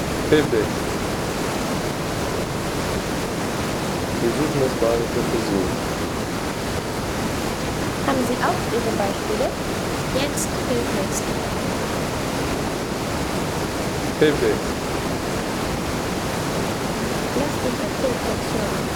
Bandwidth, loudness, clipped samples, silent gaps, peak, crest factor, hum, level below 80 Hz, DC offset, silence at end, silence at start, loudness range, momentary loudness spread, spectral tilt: over 20 kHz; -23 LUFS; under 0.1%; none; -4 dBFS; 18 dB; none; -38 dBFS; under 0.1%; 0 s; 0 s; 2 LU; 4 LU; -4.5 dB/octave